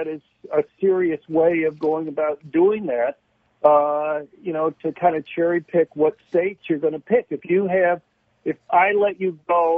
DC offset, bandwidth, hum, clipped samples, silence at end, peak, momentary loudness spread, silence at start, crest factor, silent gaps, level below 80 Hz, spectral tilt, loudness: under 0.1%; 3.7 kHz; none; under 0.1%; 0 s; -2 dBFS; 9 LU; 0 s; 18 dB; none; -66 dBFS; -9.5 dB/octave; -21 LUFS